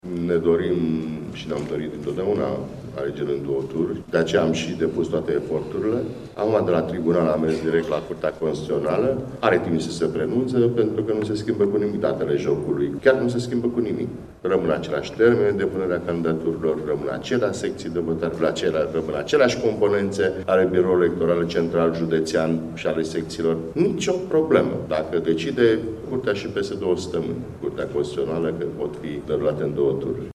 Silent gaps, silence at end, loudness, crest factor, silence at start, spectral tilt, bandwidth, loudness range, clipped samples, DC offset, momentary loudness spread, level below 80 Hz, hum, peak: none; 0 s; -23 LUFS; 20 dB; 0.05 s; -6.5 dB/octave; 12 kHz; 4 LU; under 0.1%; under 0.1%; 8 LU; -52 dBFS; none; -2 dBFS